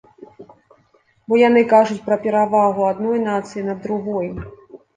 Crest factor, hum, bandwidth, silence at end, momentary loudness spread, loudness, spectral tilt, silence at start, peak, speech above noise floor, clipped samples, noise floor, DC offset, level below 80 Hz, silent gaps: 16 dB; none; 9.4 kHz; 0.2 s; 13 LU; -18 LUFS; -6.5 dB/octave; 0.4 s; -2 dBFS; 41 dB; under 0.1%; -59 dBFS; under 0.1%; -52 dBFS; none